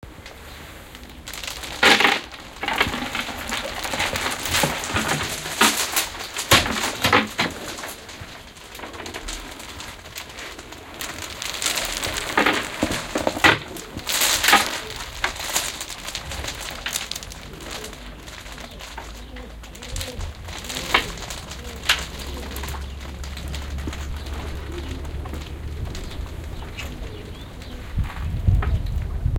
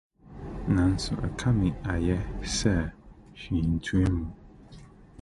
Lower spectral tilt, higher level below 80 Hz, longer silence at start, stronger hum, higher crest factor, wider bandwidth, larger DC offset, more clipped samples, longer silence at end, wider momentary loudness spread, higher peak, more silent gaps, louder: second, -2.5 dB/octave vs -6 dB/octave; about the same, -34 dBFS vs -38 dBFS; second, 0 s vs 0.3 s; neither; first, 26 dB vs 18 dB; first, 17 kHz vs 11.5 kHz; neither; neither; second, 0 s vs 0.15 s; first, 20 LU vs 12 LU; first, 0 dBFS vs -10 dBFS; neither; first, -23 LUFS vs -28 LUFS